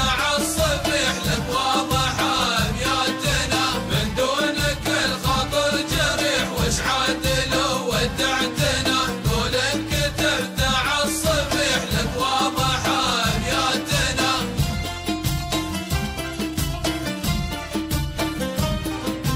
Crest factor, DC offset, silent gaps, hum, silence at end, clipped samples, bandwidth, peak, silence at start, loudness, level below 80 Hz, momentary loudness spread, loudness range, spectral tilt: 14 dB; under 0.1%; none; none; 0 s; under 0.1%; 16 kHz; -8 dBFS; 0 s; -21 LUFS; -34 dBFS; 6 LU; 5 LU; -3.5 dB/octave